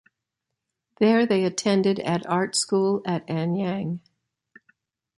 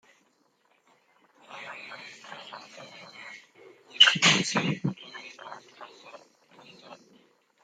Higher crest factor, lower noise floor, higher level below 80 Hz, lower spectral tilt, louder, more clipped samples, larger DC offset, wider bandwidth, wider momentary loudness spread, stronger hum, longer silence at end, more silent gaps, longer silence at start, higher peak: second, 18 dB vs 28 dB; first, -83 dBFS vs -68 dBFS; first, -68 dBFS vs -76 dBFS; first, -5 dB/octave vs -2 dB/octave; about the same, -23 LUFS vs -21 LUFS; neither; neither; second, 11.5 kHz vs 14 kHz; second, 7 LU vs 28 LU; neither; first, 1.2 s vs 0.7 s; neither; second, 1 s vs 1.5 s; second, -8 dBFS vs -4 dBFS